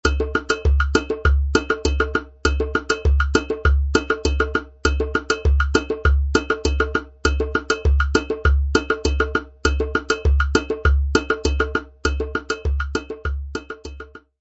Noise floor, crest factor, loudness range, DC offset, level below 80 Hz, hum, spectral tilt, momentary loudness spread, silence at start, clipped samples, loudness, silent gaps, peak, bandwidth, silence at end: -39 dBFS; 20 dB; 1 LU; under 0.1%; -22 dBFS; none; -5.5 dB/octave; 7 LU; 0.05 s; under 0.1%; -21 LUFS; none; 0 dBFS; 8 kHz; 0.2 s